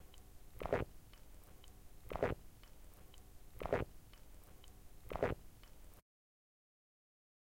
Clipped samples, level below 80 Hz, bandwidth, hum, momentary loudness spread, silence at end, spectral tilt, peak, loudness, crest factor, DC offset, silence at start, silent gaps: under 0.1%; -58 dBFS; 16.5 kHz; none; 21 LU; 1.5 s; -6.5 dB/octave; -22 dBFS; -43 LUFS; 24 dB; under 0.1%; 0 s; none